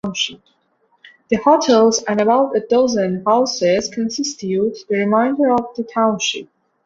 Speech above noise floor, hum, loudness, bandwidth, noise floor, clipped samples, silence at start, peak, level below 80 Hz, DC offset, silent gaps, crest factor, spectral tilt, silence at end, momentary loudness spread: 34 dB; none; -17 LUFS; 7.8 kHz; -50 dBFS; under 0.1%; 0.05 s; -2 dBFS; -58 dBFS; under 0.1%; none; 16 dB; -4 dB/octave; 0.4 s; 9 LU